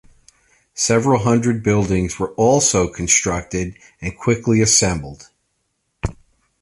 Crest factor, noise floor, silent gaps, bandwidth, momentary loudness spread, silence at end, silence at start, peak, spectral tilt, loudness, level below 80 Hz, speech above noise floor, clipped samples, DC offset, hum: 18 dB; -70 dBFS; none; 11.5 kHz; 16 LU; 0.5 s; 0.75 s; -2 dBFS; -4 dB/octave; -17 LUFS; -38 dBFS; 53 dB; under 0.1%; under 0.1%; none